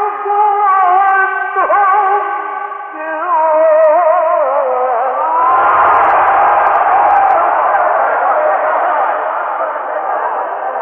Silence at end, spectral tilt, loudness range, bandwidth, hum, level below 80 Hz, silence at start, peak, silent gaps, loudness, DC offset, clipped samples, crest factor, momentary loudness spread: 0 s; -6 dB/octave; 3 LU; 3.7 kHz; none; -54 dBFS; 0 s; 0 dBFS; none; -12 LUFS; under 0.1%; under 0.1%; 12 dB; 9 LU